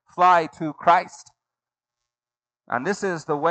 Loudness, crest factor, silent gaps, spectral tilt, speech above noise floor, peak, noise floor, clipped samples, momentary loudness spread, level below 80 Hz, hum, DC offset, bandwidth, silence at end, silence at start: -21 LUFS; 20 dB; none; -5 dB/octave; over 69 dB; -4 dBFS; under -90 dBFS; under 0.1%; 12 LU; -72 dBFS; none; under 0.1%; 8.8 kHz; 0 s; 0.15 s